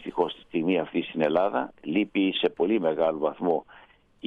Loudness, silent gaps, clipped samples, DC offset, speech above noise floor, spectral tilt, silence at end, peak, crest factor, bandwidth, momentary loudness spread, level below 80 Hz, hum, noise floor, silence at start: -26 LUFS; none; under 0.1%; under 0.1%; 29 dB; -8 dB/octave; 0 s; -10 dBFS; 16 dB; 5 kHz; 5 LU; -66 dBFS; none; -55 dBFS; 0 s